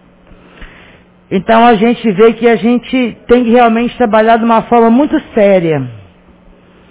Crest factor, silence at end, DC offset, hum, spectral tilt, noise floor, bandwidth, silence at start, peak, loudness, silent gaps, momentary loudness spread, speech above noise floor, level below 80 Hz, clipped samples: 10 dB; 0.9 s; under 0.1%; none; -10.5 dB/octave; -42 dBFS; 4 kHz; 0.6 s; 0 dBFS; -9 LUFS; none; 8 LU; 33 dB; -42 dBFS; 0.7%